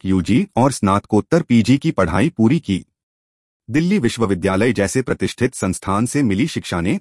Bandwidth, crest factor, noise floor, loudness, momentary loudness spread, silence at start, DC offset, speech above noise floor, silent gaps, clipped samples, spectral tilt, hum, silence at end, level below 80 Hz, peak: 12 kHz; 16 dB; under -90 dBFS; -18 LUFS; 5 LU; 0.05 s; under 0.1%; over 73 dB; 3.03-3.60 s; under 0.1%; -6 dB/octave; none; 0 s; -46 dBFS; -2 dBFS